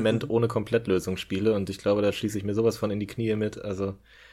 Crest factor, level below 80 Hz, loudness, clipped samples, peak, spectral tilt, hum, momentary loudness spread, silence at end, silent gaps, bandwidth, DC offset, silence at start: 14 dB; -56 dBFS; -27 LUFS; under 0.1%; -12 dBFS; -6.5 dB/octave; none; 7 LU; 0.35 s; none; 15 kHz; under 0.1%; 0 s